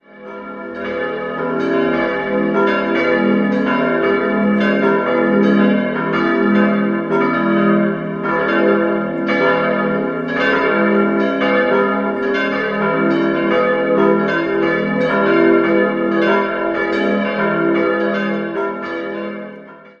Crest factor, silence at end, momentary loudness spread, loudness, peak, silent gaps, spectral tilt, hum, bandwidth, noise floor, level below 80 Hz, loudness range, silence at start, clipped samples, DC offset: 14 dB; 0.1 s; 8 LU; -16 LUFS; -2 dBFS; none; -8 dB/octave; none; 6.6 kHz; -37 dBFS; -54 dBFS; 2 LU; 0.15 s; under 0.1%; under 0.1%